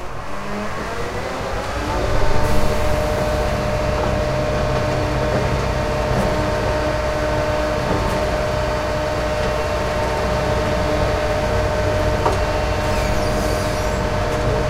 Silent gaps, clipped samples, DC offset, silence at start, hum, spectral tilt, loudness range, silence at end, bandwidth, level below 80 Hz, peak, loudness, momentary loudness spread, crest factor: none; under 0.1%; under 0.1%; 0 s; none; -5.5 dB/octave; 1 LU; 0 s; 16 kHz; -26 dBFS; -2 dBFS; -20 LUFS; 5 LU; 16 dB